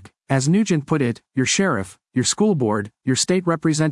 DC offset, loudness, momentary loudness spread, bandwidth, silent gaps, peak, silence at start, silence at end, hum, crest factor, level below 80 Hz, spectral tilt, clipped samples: under 0.1%; -20 LUFS; 5 LU; 12 kHz; none; -4 dBFS; 0.05 s; 0 s; none; 16 dB; -60 dBFS; -4.5 dB/octave; under 0.1%